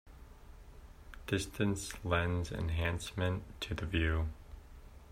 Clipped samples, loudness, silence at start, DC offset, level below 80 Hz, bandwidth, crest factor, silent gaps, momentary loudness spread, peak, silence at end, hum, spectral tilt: under 0.1%; -36 LUFS; 0.05 s; under 0.1%; -48 dBFS; 15.5 kHz; 20 dB; none; 24 LU; -16 dBFS; 0 s; none; -5.5 dB/octave